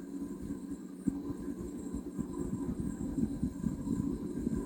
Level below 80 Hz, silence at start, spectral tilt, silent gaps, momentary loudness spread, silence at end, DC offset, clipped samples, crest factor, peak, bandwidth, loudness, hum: -50 dBFS; 0 s; -8 dB/octave; none; 6 LU; 0 s; under 0.1%; under 0.1%; 20 dB; -16 dBFS; 18 kHz; -38 LUFS; none